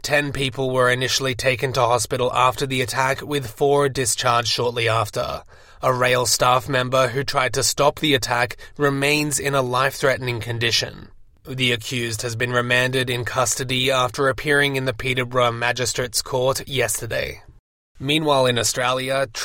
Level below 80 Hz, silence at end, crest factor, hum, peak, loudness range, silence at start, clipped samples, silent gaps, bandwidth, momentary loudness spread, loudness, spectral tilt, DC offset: -46 dBFS; 0 s; 16 dB; none; -4 dBFS; 3 LU; 0.05 s; under 0.1%; 17.59-17.95 s; 17 kHz; 6 LU; -20 LUFS; -3.5 dB/octave; under 0.1%